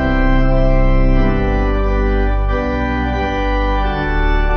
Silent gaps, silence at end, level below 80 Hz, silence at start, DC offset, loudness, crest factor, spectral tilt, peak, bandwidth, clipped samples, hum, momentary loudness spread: none; 0 s; -16 dBFS; 0 s; under 0.1%; -17 LUFS; 10 dB; -8 dB/octave; -2 dBFS; 6.2 kHz; under 0.1%; none; 3 LU